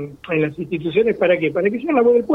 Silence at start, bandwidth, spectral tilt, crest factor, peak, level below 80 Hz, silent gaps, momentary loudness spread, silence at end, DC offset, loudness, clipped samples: 0 s; 4.1 kHz; -8.5 dB/octave; 14 dB; -4 dBFS; -54 dBFS; none; 8 LU; 0 s; under 0.1%; -18 LUFS; under 0.1%